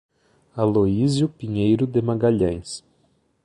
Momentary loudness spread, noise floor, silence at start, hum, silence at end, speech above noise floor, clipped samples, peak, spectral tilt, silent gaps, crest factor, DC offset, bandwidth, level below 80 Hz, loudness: 14 LU; -64 dBFS; 0.55 s; none; 0.65 s; 44 dB; under 0.1%; -6 dBFS; -7.5 dB/octave; none; 16 dB; under 0.1%; 11.5 kHz; -46 dBFS; -21 LUFS